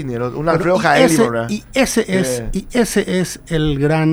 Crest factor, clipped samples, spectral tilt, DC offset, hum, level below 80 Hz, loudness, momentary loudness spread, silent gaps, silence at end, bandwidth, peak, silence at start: 16 dB; under 0.1%; -5 dB/octave; under 0.1%; none; -34 dBFS; -16 LUFS; 9 LU; none; 0 s; over 20 kHz; 0 dBFS; 0 s